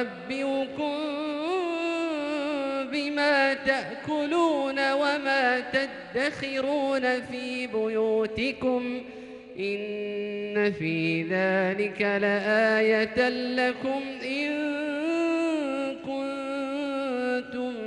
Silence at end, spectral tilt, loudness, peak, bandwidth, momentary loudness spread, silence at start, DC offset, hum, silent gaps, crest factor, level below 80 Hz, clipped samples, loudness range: 0 s; -5.5 dB/octave; -27 LUFS; -10 dBFS; 11 kHz; 8 LU; 0 s; under 0.1%; none; none; 18 dB; -64 dBFS; under 0.1%; 4 LU